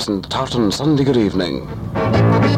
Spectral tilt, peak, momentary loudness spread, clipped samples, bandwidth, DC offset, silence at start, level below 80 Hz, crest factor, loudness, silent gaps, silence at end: -6.5 dB/octave; -2 dBFS; 8 LU; under 0.1%; 13.5 kHz; under 0.1%; 0 s; -38 dBFS; 14 dB; -17 LUFS; none; 0 s